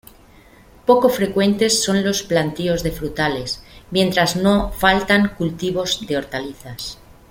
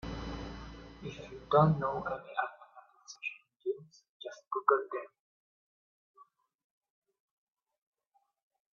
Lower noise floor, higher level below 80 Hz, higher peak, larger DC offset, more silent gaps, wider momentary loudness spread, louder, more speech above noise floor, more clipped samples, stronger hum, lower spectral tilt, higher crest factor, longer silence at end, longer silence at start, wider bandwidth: second, -47 dBFS vs -77 dBFS; first, -40 dBFS vs -56 dBFS; first, -2 dBFS vs -10 dBFS; neither; second, none vs 4.09-4.20 s, 5.20-6.14 s; second, 13 LU vs 20 LU; first, -18 LUFS vs -34 LUFS; second, 29 dB vs 47 dB; neither; neither; second, -4 dB/octave vs -6 dB/octave; second, 18 dB vs 26 dB; second, 0.35 s vs 2.55 s; first, 0.85 s vs 0.05 s; first, 16.5 kHz vs 7 kHz